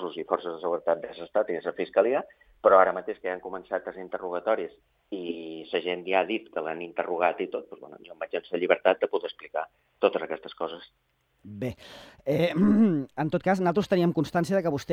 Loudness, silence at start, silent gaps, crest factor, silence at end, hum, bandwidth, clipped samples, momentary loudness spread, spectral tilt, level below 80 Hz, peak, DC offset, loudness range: -27 LUFS; 0 s; none; 22 dB; 0 s; none; 13.5 kHz; under 0.1%; 14 LU; -7 dB/octave; -64 dBFS; -6 dBFS; under 0.1%; 5 LU